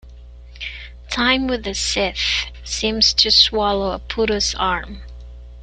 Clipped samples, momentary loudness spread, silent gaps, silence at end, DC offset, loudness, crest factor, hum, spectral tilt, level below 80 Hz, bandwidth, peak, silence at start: under 0.1%; 19 LU; none; 0 s; under 0.1%; -17 LUFS; 20 dB; 60 Hz at -35 dBFS; -2 dB/octave; -36 dBFS; 12 kHz; 0 dBFS; 0.05 s